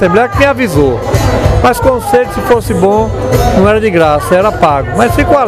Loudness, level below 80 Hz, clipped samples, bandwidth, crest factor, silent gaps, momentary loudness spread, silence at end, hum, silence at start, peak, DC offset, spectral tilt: -9 LUFS; -22 dBFS; 0.4%; 16 kHz; 8 dB; none; 3 LU; 0 s; none; 0 s; 0 dBFS; under 0.1%; -6 dB/octave